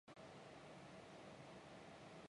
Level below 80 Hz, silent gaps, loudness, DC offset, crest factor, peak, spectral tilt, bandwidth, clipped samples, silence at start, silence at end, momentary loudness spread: -82 dBFS; none; -59 LUFS; under 0.1%; 14 dB; -46 dBFS; -5 dB/octave; 11 kHz; under 0.1%; 0.05 s; 0 s; 1 LU